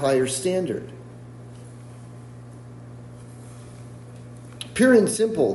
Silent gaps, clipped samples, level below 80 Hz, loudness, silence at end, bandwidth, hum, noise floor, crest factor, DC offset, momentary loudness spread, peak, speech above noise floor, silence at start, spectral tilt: none; under 0.1%; -58 dBFS; -21 LUFS; 0 s; 11.5 kHz; 60 Hz at -40 dBFS; -41 dBFS; 20 dB; under 0.1%; 24 LU; -6 dBFS; 21 dB; 0 s; -5 dB/octave